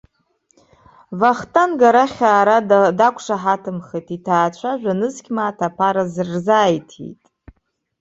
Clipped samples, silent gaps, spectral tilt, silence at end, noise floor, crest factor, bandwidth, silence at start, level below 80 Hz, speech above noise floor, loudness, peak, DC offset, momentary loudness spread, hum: under 0.1%; none; -5.5 dB/octave; 0.9 s; -63 dBFS; 16 dB; 8 kHz; 1.1 s; -58 dBFS; 47 dB; -17 LUFS; -2 dBFS; under 0.1%; 14 LU; none